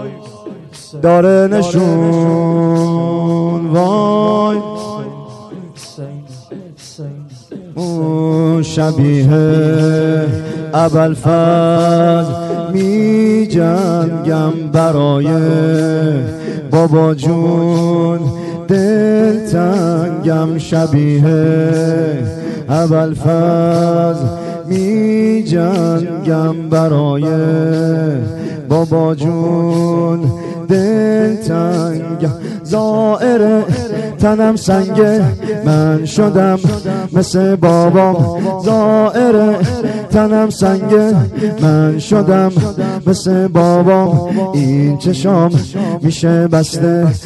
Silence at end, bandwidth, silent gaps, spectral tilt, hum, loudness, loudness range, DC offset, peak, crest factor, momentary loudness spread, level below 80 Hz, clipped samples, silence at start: 0 s; 12 kHz; none; -7.5 dB/octave; none; -12 LUFS; 3 LU; under 0.1%; 0 dBFS; 12 dB; 10 LU; -44 dBFS; under 0.1%; 0 s